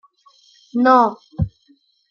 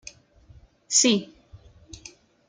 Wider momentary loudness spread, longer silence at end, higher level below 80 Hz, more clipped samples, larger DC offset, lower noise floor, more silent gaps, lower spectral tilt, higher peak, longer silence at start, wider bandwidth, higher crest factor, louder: second, 13 LU vs 25 LU; second, 0.65 s vs 0.95 s; first, -44 dBFS vs -58 dBFS; neither; neither; first, -58 dBFS vs -53 dBFS; neither; first, -8 dB/octave vs -2 dB/octave; first, -2 dBFS vs -6 dBFS; second, 0.75 s vs 0.9 s; second, 6.8 kHz vs 10.5 kHz; about the same, 18 dB vs 22 dB; first, -18 LUFS vs -21 LUFS